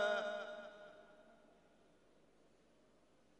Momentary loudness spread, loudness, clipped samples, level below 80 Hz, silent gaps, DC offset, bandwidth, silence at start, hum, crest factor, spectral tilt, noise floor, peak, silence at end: 25 LU; -44 LUFS; under 0.1%; -86 dBFS; none; under 0.1%; 10.5 kHz; 0 s; none; 20 dB; -2.5 dB/octave; -72 dBFS; -26 dBFS; 2.05 s